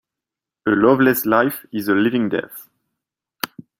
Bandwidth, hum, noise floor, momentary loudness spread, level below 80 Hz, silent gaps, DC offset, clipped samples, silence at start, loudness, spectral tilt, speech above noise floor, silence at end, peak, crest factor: 16.5 kHz; none; -87 dBFS; 15 LU; -60 dBFS; none; under 0.1%; under 0.1%; 0.65 s; -18 LUFS; -5.5 dB/octave; 69 dB; 0.2 s; -2 dBFS; 18 dB